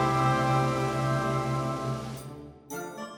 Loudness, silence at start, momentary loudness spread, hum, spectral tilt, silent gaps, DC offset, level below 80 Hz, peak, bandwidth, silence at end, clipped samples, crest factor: -28 LUFS; 0 s; 16 LU; none; -6 dB/octave; none; under 0.1%; -52 dBFS; -14 dBFS; 18.5 kHz; 0 s; under 0.1%; 16 dB